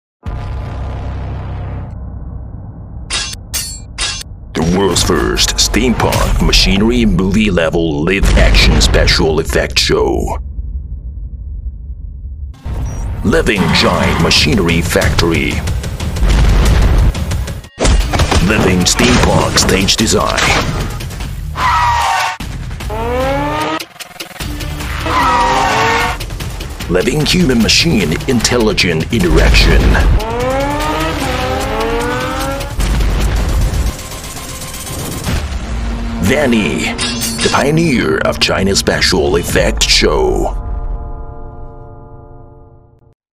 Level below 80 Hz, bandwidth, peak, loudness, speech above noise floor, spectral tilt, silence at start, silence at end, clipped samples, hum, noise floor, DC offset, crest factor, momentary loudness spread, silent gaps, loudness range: -18 dBFS; 16.5 kHz; 0 dBFS; -13 LUFS; 31 dB; -4 dB/octave; 0.25 s; 0.7 s; under 0.1%; none; -42 dBFS; under 0.1%; 14 dB; 16 LU; none; 7 LU